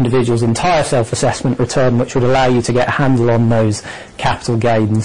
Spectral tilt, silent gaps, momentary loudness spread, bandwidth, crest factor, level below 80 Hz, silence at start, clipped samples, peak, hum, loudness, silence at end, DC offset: -6 dB/octave; none; 5 LU; 11 kHz; 8 dB; -36 dBFS; 0 s; under 0.1%; -6 dBFS; none; -14 LUFS; 0 s; 2%